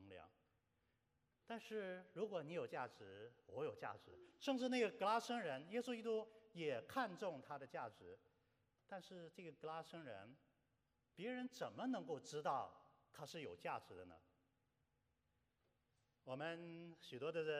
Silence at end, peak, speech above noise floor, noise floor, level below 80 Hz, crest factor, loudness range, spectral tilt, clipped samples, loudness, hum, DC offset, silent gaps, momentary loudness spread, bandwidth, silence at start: 0 s; -28 dBFS; 38 dB; -86 dBFS; under -90 dBFS; 22 dB; 12 LU; -5 dB/octave; under 0.1%; -48 LUFS; none; under 0.1%; none; 17 LU; 13.5 kHz; 0 s